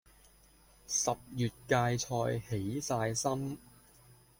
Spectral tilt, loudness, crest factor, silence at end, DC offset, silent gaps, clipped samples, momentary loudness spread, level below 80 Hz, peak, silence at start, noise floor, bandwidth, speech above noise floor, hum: -4.5 dB/octave; -34 LUFS; 22 dB; 0.25 s; under 0.1%; none; under 0.1%; 6 LU; -62 dBFS; -14 dBFS; 0.9 s; -62 dBFS; 16.5 kHz; 29 dB; none